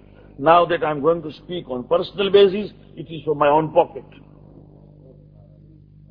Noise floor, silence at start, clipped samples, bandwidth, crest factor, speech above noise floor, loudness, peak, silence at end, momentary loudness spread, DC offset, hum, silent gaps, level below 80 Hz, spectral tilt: -47 dBFS; 0.4 s; under 0.1%; 5.2 kHz; 20 dB; 28 dB; -19 LUFS; 0 dBFS; 2.1 s; 17 LU; under 0.1%; 50 Hz at -45 dBFS; none; -52 dBFS; -8.5 dB/octave